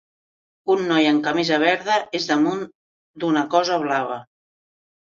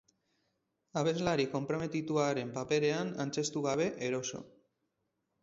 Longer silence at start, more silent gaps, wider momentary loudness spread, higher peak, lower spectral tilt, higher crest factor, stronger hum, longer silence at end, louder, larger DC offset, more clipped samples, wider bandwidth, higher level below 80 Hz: second, 0.65 s vs 0.95 s; first, 2.75-3.14 s vs none; first, 12 LU vs 6 LU; first, -4 dBFS vs -16 dBFS; about the same, -4.5 dB/octave vs -5 dB/octave; about the same, 18 dB vs 18 dB; neither; about the same, 0.9 s vs 0.95 s; first, -20 LUFS vs -34 LUFS; neither; neither; about the same, 7.4 kHz vs 7.8 kHz; about the same, -68 dBFS vs -68 dBFS